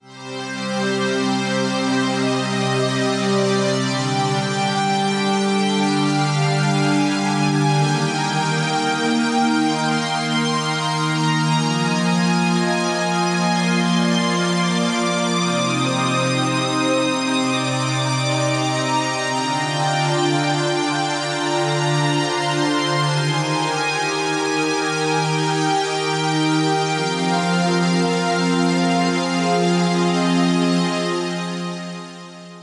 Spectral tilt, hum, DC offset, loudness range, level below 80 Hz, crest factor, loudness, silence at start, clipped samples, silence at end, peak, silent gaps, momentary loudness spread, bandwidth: -4.5 dB/octave; none; under 0.1%; 1 LU; -64 dBFS; 12 dB; -19 LUFS; 0.05 s; under 0.1%; 0 s; -8 dBFS; none; 3 LU; 11.5 kHz